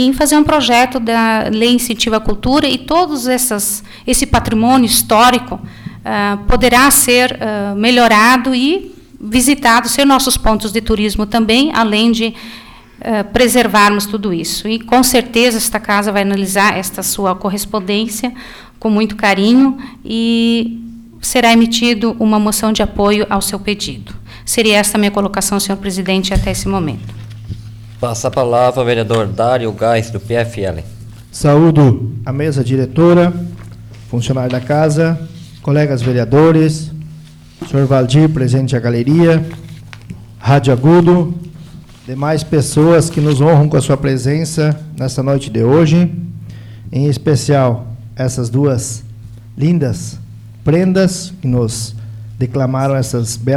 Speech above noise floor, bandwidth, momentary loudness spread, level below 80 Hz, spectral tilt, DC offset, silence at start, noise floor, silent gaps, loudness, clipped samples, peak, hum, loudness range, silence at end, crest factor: 23 dB; 19.5 kHz; 17 LU; -32 dBFS; -5 dB/octave; under 0.1%; 0 s; -36 dBFS; none; -13 LUFS; under 0.1%; 0 dBFS; none; 5 LU; 0 s; 12 dB